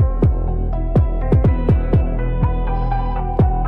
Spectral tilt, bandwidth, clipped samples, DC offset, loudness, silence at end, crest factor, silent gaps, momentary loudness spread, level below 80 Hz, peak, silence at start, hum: -11 dB/octave; 4.2 kHz; under 0.1%; under 0.1%; -19 LUFS; 0 s; 10 dB; none; 6 LU; -18 dBFS; -4 dBFS; 0 s; none